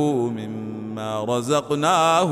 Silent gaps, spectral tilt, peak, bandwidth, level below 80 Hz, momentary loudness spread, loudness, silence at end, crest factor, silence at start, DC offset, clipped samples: none; -5 dB/octave; -6 dBFS; 15.5 kHz; -64 dBFS; 13 LU; -22 LUFS; 0 s; 16 dB; 0 s; under 0.1%; under 0.1%